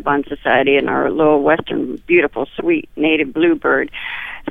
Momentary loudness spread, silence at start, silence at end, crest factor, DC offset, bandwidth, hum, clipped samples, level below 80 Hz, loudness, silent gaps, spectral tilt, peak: 9 LU; 0.05 s; 0 s; 14 dB; 0.8%; 3.9 kHz; none; under 0.1%; -46 dBFS; -16 LUFS; none; -7.5 dB/octave; -2 dBFS